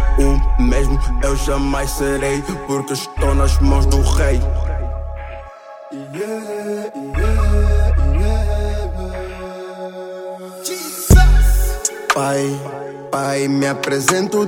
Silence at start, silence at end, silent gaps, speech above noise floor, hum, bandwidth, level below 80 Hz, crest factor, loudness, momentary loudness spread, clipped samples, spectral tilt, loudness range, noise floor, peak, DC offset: 0 s; 0 s; none; 19 dB; none; 17 kHz; -18 dBFS; 16 dB; -18 LUFS; 14 LU; under 0.1%; -5.5 dB/octave; 5 LU; -36 dBFS; 0 dBFS; under 0.1%